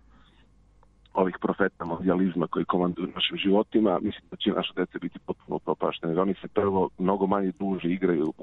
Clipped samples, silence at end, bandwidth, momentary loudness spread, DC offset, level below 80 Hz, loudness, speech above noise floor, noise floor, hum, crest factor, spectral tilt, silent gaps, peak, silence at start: under 0.1%; 0 s; 4.1 kHz; 8 LU; under 0.1%; -58 dBFS; -27 LUFS; 32 dB; -58 dBFS; none; 18 dB; -9 dB/octave; none; -8 dBFS; 1.15 s